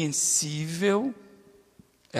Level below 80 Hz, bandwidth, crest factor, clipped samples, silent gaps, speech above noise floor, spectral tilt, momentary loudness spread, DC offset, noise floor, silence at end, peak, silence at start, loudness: -70 dBFS; 15.5 kHz; 20 dB; under 0.1%; none; 32 dB; -3.5 dB/octave; 11 LU; under 0.1%; -59 dBFS; 0 s; -8 dBFS; 0 s; -25 LUFS